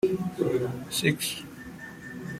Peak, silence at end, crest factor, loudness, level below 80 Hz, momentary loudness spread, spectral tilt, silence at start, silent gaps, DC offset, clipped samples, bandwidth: -10 dBFS; 0 s; 20 dB; -29 LUFS; -60 dBFS; 15 LU; -4.5 dB/octave; 0.05 s; none; under 0.1%; under 0.1%; 16 kHz